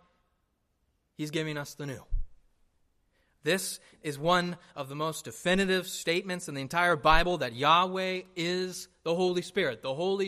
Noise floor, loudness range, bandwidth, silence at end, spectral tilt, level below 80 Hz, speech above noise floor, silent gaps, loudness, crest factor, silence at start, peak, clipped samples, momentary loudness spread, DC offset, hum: -75 dBFS; 9 LU; 15 kHz; 0 s; -4 dB/octave; -44 dBFS; 46 dB; none; -29 LUFS; 24 dB; 1.2 s; -6 dBFS; under 0.1%; 15 LU; under 0.1%; none